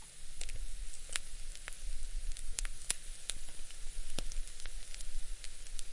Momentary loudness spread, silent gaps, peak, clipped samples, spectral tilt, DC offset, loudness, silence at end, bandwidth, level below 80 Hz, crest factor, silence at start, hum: 10 LU; none; -10 dBFS; under 0.1%; -1 dB/octave; under 0.1%; -44 LUFS; 0 s; 11.5 kHz; -40 dBFS; 26 dB; 0 s; none